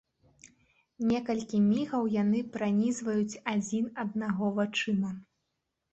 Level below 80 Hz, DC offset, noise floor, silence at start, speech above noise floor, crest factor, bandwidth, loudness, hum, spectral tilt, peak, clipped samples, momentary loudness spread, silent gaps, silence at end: -68 dBFS; under 0.1%; -83 dBFS; 0.45 s; 53 dB; 14 dB; 8.4 kHz; -30 LUFS; none; -6 dB/octave; -16 dBFS; under 0.1%; 6 LU; none; 0.7 s